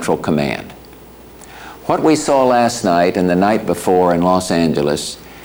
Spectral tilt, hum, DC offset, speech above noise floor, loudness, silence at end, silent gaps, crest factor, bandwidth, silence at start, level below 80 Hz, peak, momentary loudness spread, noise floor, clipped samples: -5.5 dB/octave; none; under 0.1%; 24 dB; -15 LUFS; 0 s; none; 12 dB; over 20 kHz; 0 s; -46 dBFS; -4 dBFS; 14 LU; -39 dBFS; under 0.1%